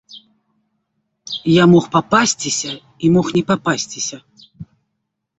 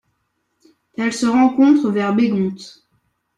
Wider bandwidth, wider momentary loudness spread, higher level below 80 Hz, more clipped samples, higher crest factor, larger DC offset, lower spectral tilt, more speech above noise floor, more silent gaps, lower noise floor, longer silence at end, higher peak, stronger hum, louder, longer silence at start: second, 8.4 kHz vs 11.5 kHz; about the same, 13 LU vs 12 LU; first, -54 dBFS vs -60 dBFS; neither; about the same, 18 dB vs 16 dB; neither; second, -4.5 dB/octave vs -6 dB/octave; first, 59 dB vs 54 dB; neither; first, -75 dBFS vs -70 dBFS; about the same, 0.75 s vs 0.7 s; first, 0 dBFS vs -4 dBFS; neither; about the same, -16 LUFS vs -16 LUFS; second, 0.15 s vs 1 s